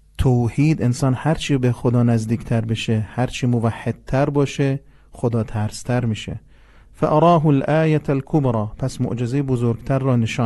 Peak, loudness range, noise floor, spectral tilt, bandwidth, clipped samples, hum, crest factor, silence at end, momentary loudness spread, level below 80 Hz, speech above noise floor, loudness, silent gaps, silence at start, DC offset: -4 dBFS; 3 LU; -47 dBFS; -7.5 dB/octave; 12 kHz; under 0.1%; none; 16 dB; 0 s; 8 LU; -40 dBFS; 28 dB; -20 LUFS; none; 0.2 s; under 0.1%